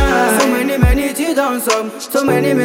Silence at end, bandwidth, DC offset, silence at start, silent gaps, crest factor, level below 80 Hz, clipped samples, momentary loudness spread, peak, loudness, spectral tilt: 0 s; 16.5 kHz; under 0.1%; 0 s; none; 14 dB; -22 dBFS; under 0.1%; 5 LU; 0 dBFS; -15 LUFS; -5 dB/octave